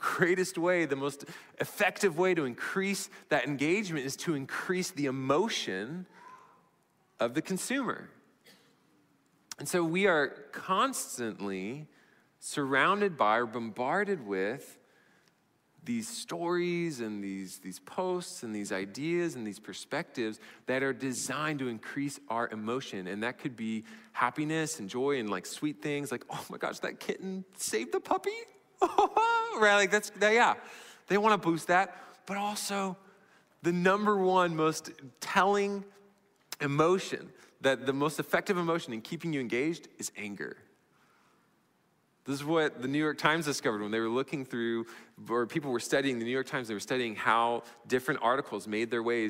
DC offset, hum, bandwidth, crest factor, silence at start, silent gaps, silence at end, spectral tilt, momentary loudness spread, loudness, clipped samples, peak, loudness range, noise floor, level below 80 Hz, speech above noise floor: under 0.1%; none; 16 kHz; 20 dB; 0 s; none; 0 s; -4.5 dB/octave; 13 LU; -31 LUFS; under 0.1%; -12 dBFS; 8 LU; -71 dBFS; -76 dBFS; 40 dB